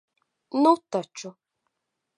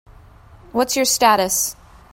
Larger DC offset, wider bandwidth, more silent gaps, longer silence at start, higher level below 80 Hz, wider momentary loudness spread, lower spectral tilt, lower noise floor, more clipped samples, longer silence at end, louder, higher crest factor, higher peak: neither; second, 11 kHz vs 16.5 kHz; neither; second, 0.55 s vs 0.75 s; second, -84 dBFS vs -48 dBFS; first, 19 LU vs 9 LU; first, -5.5 dB/octave vs -1.5 dB/octave; first, -82 dBFS vs -45 dBFS; neither; first, 0.9 s vs 0.4 s; second, -24 LUFS vs -17 LUFS; about the same, 22 dB vs 18 dB; second, -6 dBFS vs -2 dBFS